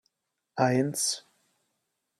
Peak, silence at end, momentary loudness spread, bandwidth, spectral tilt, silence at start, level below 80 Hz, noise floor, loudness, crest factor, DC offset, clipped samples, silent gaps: -10 dBFS; 1 s; 12 LU; 15.5 kHz; -4 dB/octave; 0.55 s; -76 dBFS; -80 dBFS; -27 LUFS; 22 dB; under 0.1%; under 0.1%; none